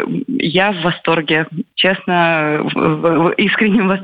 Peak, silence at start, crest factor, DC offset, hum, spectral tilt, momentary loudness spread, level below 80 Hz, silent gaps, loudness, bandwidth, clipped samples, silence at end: -2 dBFS; 0 s; 14 dB; under 0.1%; none; -8 dB/octave; 4 LU; -52 dBFS; none; -15 LUFS; 5 kHz; under 0.1%; 0 s